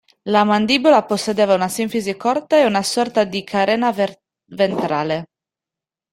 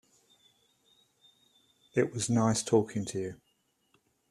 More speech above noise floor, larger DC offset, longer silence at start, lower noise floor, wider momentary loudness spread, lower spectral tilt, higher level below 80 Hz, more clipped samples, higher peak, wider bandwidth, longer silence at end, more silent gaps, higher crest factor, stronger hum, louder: first, 71 dB vs 45 dB; neither; second, 0.25 s vs 1.95 s; first, -88 dBFS vs -74 dBFS; second, 7 LU vs 10 LU; about the same, -4.5 dB/octave vs -5 dB/octave; first, -60 dBFS vs -68 dBFS; neither; first, -2 dBFS vs -12 dBFS; first, 16 kHz vs 13.5 kHz; about the same, 0.9 s vs 0.95 s; neither; second, 16 dB vs 22 dB; neither; first, -18 LUFS vs -30 LUFS